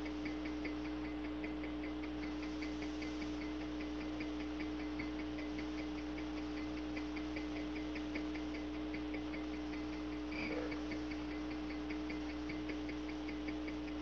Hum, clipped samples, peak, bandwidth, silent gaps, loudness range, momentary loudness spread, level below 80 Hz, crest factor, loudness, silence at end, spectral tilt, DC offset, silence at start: 60 Hz at -55 dBFS; under 0.1%; -28 dBFS; 7.2 kHz; none; 0 LU; 1 LU; -54 dBFS; 14 dB; -43 LUFS; 0 s; -6 dB/octave; 0.1%; 0 s